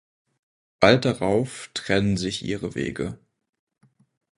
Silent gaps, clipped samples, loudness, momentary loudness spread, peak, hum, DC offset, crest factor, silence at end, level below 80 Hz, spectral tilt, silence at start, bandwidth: none; under 0.1%; -23 LUFS; 14 LU; 0 dBFS; none; under 0.1%; 26 dB; 1.25 s; -50 dBFS; -5.5 dB/octave; 0.8 s; 11.5 kHz